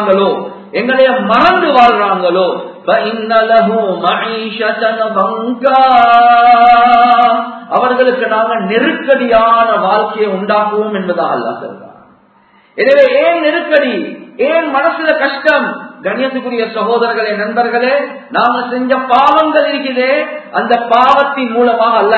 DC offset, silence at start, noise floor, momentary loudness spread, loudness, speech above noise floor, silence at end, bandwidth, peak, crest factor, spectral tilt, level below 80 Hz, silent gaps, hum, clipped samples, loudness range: under 0.1%; 0 s; -47 dBFS; 10 LU; -11 LUFS; 37 dB; 0 s; 6.6 kHz; 0 dBFS; 10 dB; -6.5 dB/octave; -52 dBFS; none; none; 0.2%; 5 LU